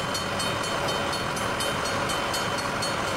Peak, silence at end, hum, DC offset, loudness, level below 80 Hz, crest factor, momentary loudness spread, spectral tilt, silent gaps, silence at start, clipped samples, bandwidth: -14 dBFS; 0 s; none; under 0.1%; -26 LUFS; -48 dBFS; 12 dB; 1 LU; -3 dB/octave; none; 0 s; under 0.1%; 16 kHz